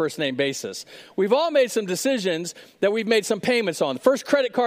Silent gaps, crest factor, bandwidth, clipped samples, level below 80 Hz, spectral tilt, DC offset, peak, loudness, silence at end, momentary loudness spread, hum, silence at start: none; 20 dB; 16 kHz; under 0.1%; -74 dBFS; -3.5 dB/octave; under 0.1%; -2 dBFS; -22 LUFS; 0 s; 11 LU; none; 0 s